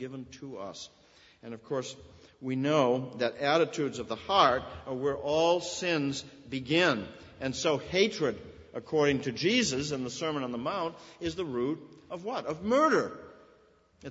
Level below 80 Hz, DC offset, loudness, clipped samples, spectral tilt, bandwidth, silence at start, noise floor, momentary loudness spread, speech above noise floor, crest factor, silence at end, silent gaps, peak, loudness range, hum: -62 dBFS; under 0.1%; -30 LUFS; under 0.1%; -4.5 dB/octave; 8 kHz; 0 s; -63 dBFS; 18 LU; 33 dB; 22 dB; 0 s; none; -10 dBFS; 4 LU; none